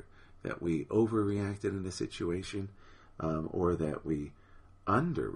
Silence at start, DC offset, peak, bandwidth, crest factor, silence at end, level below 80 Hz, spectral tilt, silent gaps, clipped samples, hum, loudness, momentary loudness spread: 0 s; under 0.1%; -16 dBFS; 11 kHz; 18 dB; 0 s; -54 dBFS; -7 dB/octave; none; under 0.1%; none; -34 LUFS; 11 LU